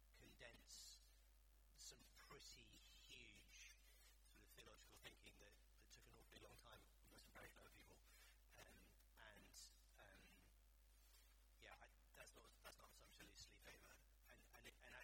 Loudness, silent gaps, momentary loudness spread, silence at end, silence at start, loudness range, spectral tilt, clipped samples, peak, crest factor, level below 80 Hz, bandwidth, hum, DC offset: -66 LUFS; none; 6 LU; 0 s; 0 s; 4 LU; -2 dB/octave; under 0.1%; -48 dBFS; 20 dB; -74 dBFS; 18 kHz; none; under 0.1%